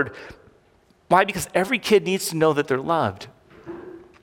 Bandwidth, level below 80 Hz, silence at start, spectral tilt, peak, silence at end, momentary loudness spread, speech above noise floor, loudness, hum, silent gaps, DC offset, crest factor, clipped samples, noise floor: 17.5 kHz; -58 dBFS; 0 s; -4.5 dB/octave; -2 dBFS; 0.25 s; 21 LU; 37 dB; -21 LUFS; none; none; under 0.1%; 20 dB; under 0.1%; -59 dBFS